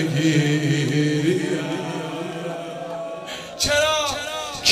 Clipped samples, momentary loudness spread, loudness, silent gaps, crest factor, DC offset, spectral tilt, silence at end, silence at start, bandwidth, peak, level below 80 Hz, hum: under 0.1%; 12 LU; -22 LUFS; none; 20 dB; under 0.1%; -4.5 dB/octave; 0 s; 0 s; 16 kHz; -2 dBFS; -50 dBFS; none